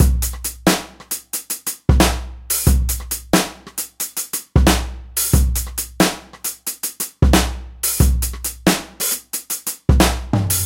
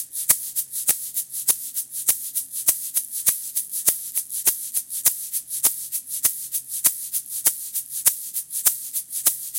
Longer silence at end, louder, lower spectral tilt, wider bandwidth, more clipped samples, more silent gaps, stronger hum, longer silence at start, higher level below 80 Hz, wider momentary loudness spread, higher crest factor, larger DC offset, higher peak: about the same, 0 s vs 0 s; about the same, -19 LUFS vs -21 LUFS; first, -4 dB/octave vs 1.5 dB/octave; about the same, 17 kHz vs 17 kHz; neither; neither; neither; about the same, 0 s vs 0 s; first, -22 dBFS vs -66 dBFS; about the same, 9 LU vs 7 LU; second, 18 dB vs 24 dB; neither; about the same, 0 dBFS vs 0 dBFS